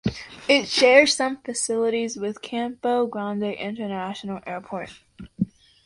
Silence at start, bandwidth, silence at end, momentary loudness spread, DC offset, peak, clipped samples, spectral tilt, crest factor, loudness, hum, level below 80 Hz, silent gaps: 0.05 s; 11.5 kHz; 0.4 s; 17 LU; under 0.1%; -2 dBFS; under 0.1%; -3.5 dB/octave; 22 dB; -23 LUFS; none; -56 dBFS; none